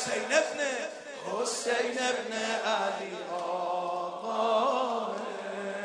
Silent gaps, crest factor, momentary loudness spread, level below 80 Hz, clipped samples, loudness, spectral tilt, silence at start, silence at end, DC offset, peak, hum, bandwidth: none; 22 dB; 9 LU; -84 dBFS; under 0.1%; -31 LUFS; -2 dB/octave; 0 s; 0 s; under 0.1%; -10 dBFS; none; 10.5 kHz